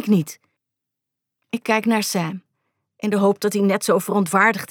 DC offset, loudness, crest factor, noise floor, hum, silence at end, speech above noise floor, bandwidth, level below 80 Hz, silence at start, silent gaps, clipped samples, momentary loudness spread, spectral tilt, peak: under 0.1%; -20 LUFS; 18 dB; -83 dBFS; none; 0.05 s; 64 dB; 18.5 kHz; -76 dBFS; 0 s; none; under 0.1%; 12 LU; -5 dB/octave; -4 dBFS